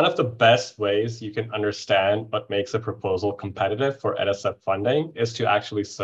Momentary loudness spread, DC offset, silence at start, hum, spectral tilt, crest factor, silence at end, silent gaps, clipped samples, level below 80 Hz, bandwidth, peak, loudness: 9 LU; under 0.1%; 0 s; none; -5 dB/octave; 20 dB; 0 s; none; under 0.1%; -54 dBFS; 8.2 kHz; -4 dBFS; -24 LUFS